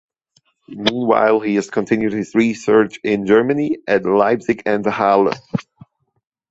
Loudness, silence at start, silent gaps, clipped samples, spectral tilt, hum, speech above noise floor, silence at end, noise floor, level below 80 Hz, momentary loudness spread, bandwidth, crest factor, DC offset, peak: -17 LUFS; 0.7 s; none; under 0.1%; -6 dB/octave; none; 46 dB; 0.9 s; -62 dBFS; -56 dBFS; 6 LU; 8 kHz; 16 dB; under 0.1%; -2 dBFS